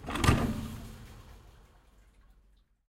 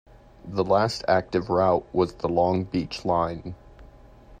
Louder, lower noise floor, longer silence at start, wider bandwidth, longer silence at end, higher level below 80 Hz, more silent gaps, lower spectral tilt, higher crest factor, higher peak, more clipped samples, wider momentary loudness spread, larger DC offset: second, -30 LUFS vs -24 LUFS; first, -65 dBFS vs -49 dBFS; second, 0 s vs 0.45 s; first, 16 kHz vs 9.8 kHz; first, 1.4 s vs 0.05 s; first, -42 dBFS vs -50 dBFS; neither; about the same, -5.5 dB/octave vs -6.5 dB/octave; first, 26 dB vs 18 dB; about the same, -10 dBFS vs -8 dBFS; neither; first, 26 LU vs 10 LU; neither